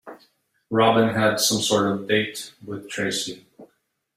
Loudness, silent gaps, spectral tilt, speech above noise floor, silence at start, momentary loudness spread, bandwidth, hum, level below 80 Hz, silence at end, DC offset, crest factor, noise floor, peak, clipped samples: -21 LUFS; none; -3.5 dB/octave; 47 dB; 0.05 s; 16 LU; 16 kHz; none; -62 dBFS; 0.5 s; under 0.1%; 20 dB; -69 dBFS; -4 dBFS; under 0.1%